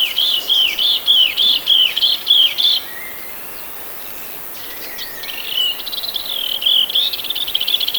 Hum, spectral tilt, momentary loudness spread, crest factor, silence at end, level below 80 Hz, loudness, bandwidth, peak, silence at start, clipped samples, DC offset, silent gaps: none; 1 dB/octave; 16 LU; 16 dB; 0 s; -54 dBFS; -13 LUFS; over 20 kHz; -2 dBFS; 0 s; under 0.1%; under 0.1%; none